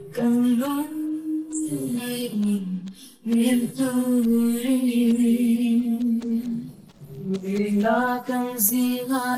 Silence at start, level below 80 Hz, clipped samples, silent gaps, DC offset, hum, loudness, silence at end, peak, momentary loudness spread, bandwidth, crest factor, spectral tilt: 0 s; -64 dBFS; under 0.1%; none; under 0.1%; none; -23 LUFS; 0 s; -6 dBFS; 10 LU; 16.5 kHz; 16 dB; -5 dB/octave